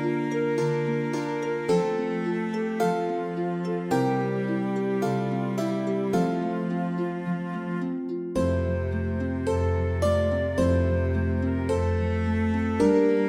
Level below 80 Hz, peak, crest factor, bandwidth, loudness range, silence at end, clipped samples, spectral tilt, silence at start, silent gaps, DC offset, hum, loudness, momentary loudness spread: -42 dBFS; -10 dBFS; 14 dB; 13 kHz; 3 LU; 0 s; under 0.1%; -7.5 dB/octave; 0 s; none; under 0.1%; none; -26 LUFS; 5 LU